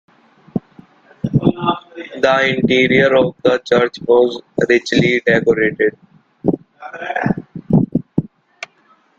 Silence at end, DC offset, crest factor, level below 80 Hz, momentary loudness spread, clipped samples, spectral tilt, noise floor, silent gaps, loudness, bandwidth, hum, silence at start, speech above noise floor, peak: 0.55 s; under 0.1%; 16 dB; -48 dBFS; 14 LU; under 0.1%; -6.5 dB/octave; -54 dBFS; none; -16 LUFS; 7.8 kHz; none; 0.55 s; 40 dB; 0 dBFS